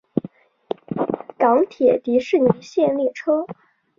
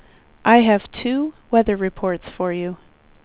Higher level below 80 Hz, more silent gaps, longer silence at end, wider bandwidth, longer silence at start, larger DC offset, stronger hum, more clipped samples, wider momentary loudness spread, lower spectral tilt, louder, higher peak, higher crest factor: second, -62 dBFS vs -48 dBFS; neither; about the same, 0.45 s vs 0.5 s; first, 7.4 kHz vs 4 kHz; second, 0.15 s vs 0.45 s; neither; neither; neither; about the same, 11 LU vs 12 LU; second, -7.5 dB/octave vs -10 dB/octave; about the same, -20 LUFS vs -19 LUFS; about the same, -2 dBFS vs -2 dBFS; about the same, 18 dB vs 18 dB